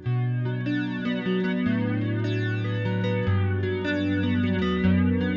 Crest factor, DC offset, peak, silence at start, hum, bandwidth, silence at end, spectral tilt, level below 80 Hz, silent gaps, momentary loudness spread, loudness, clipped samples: 14 dB; under 0.1%; -12 dBFS; 0 s; none; 7 kHz; 0 s; -8.5 dB/octave; -54 dBFS; none; 5 LU; -25 LUFS; under 0.1%